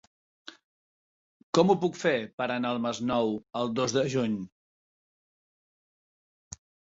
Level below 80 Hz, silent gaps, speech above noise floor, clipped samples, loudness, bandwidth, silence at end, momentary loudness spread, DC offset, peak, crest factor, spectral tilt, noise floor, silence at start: -66 dBFS; 0.64-1.53 s, 2.33-2.38 s; over 63 dB; under 0.1%; -28 LUFS; 8 kHz; 2.45 s; 22 LU; under 0.1%; -8 dBFS; 22 dB; -5 dB/octave; under -90 dBFS; 0.45 s